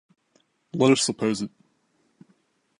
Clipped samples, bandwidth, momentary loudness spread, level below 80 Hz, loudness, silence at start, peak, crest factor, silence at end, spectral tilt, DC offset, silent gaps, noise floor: under 0.1%; 11.5 kHz; 17 LU; -70 dBFS; -23 LUFS; 0.75 s; -6 dBFS; 22 dB; 1.3 s; -4.5 dB/octave; under 0.1%; none; -68 dBFS